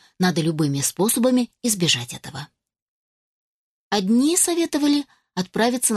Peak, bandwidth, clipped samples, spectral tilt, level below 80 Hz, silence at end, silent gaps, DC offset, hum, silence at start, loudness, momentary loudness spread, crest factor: -4 dBFS; 13 kHz; under 0.1%; -3.5 dB/octave; -62 dBFS; 0 s; 2.82-3.91 s; under 0.1%; none; 0.2 s; -20 LUFS; 13 LU; 18 dB